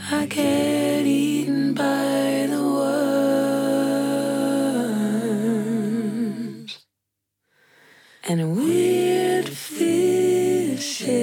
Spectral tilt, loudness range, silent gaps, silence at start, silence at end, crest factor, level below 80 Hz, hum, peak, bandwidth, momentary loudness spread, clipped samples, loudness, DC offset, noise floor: -5 dB/octave; 6 LU; none; 0 s; 0 s; 12 dB; -80 dBFS; none; -10 dBFS; 18 kHz; 7 LU; under 0.1%; -22 LUFS; under 0.1%; -80 dBFS